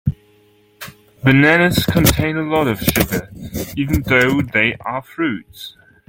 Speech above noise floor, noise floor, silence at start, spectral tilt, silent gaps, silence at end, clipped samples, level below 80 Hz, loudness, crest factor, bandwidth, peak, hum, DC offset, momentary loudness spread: 37 dB; -53 dBFS; 0.05 s; -5 dB/octave; none; 0.4 s; under 0.1%; -36 dBFS; -16 LUFS; 18 dB; 17 kHz; 0 dBFS; none; under 0.1%; 22 LU